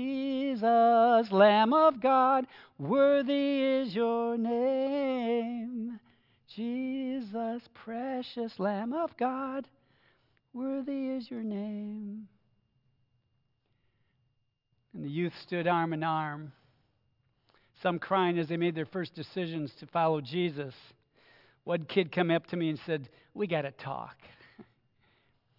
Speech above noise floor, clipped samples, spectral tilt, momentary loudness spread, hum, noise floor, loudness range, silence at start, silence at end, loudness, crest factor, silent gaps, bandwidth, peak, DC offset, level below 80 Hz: 46 dB; under 0.1%; -9 dB/octave; 17 LU; none; -77 dBFS; 13 LU; 0 s; 0.95 s; -30 LUFS; 22 dB; none; 5.8 kHz; -10 dBFS; under 0.1%; -80 dBFS